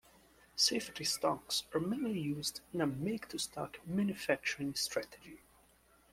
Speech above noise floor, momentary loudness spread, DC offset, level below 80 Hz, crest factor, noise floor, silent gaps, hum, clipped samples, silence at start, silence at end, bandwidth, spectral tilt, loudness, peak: 30 dB; 10 LU; under 0.1%; -68 dBFS; 22 dB; -67 dBFS; none; none; under 0.1%; 0.55 s; 0.75 s; 16.5 kHz; -3.5 dB/octave; -36 LUFS; -16 dBFS